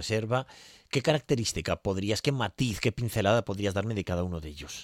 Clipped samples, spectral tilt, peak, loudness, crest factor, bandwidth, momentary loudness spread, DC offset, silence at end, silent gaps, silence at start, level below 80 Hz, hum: under 0.1%; -5 dB/octave; -10 dBFS; -29 LUFS; 18 dB; 16.5 kHz; 6 LU; under 0.1%; 0 s; none; 0 s; -52 dBFS; none